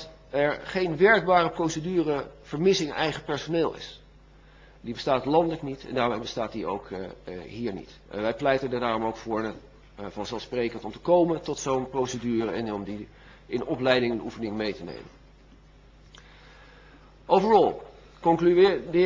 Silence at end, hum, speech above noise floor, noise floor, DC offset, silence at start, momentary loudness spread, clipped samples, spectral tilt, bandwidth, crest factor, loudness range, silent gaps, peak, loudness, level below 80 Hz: 0 s; none; 27 dB; -53 dBFS; under 0.1%; 0 s; 18 LU; under 0.1%; -5.5 dB/octave; 7.6 kHz; 22 dB; 6 LU; none; -6 dBFS; -26 LUFS; -54 dBFS